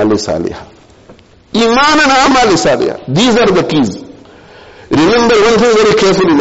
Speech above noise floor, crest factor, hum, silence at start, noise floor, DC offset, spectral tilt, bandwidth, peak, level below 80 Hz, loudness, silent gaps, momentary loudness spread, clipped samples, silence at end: 31 dB; 10 dB; none; 0 s; -40 dBFS; under 0.1%; -4.5 dB/octave; 8.2 kHz; -2 dBFS; -38 dBFS; -9 LUFS; none; 10 LU; under 0.1%; 0 s